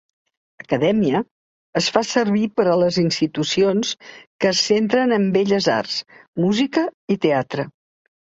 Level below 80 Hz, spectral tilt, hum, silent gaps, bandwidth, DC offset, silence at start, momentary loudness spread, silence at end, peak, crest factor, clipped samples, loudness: -60 dBFS; -5 dB/octave; none; 1.31-1.73 s, 4.27-4.39 s, 6.28-6.33 s, 6.94-7.08 s; 8 kHz; under 0.1%; 0.7 s; 10 LU; 0.6 s; 0 dBFS; 20 dB; under 0.1%; -19 LUFS